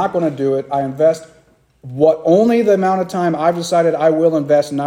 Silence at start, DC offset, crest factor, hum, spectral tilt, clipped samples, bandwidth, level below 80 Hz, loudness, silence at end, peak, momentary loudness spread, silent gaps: 0 s; under 0.1%; 14 dB; none; -6.5 dB/octave; under 0.1%; 15.5 kHz; -60 dBFS; -15 LUFS; 0 s; 0 dBFS; 6 LU; none